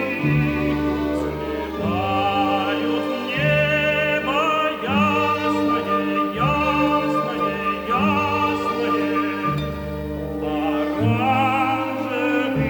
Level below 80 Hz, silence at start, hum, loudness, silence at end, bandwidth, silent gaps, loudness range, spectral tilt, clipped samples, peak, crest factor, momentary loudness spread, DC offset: -42 dBFS; 0 s; none; -21 LUFS; 0 s; over 20 kHz; none; 3 LU; -6.5 dB/octave; under 0.1%; -8 dBFS; 14 dB; 6 LU; under 0.1%